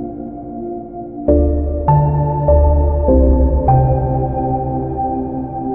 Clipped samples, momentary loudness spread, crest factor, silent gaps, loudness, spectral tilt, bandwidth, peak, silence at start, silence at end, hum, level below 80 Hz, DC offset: under 0.1%; 14 LU; 14 dB; none; -15 LUFS; -15 dB/octave; 2.4 kHz; -2 dBFS; 0 s; 0 s; none; -18 dBFS; 0.3%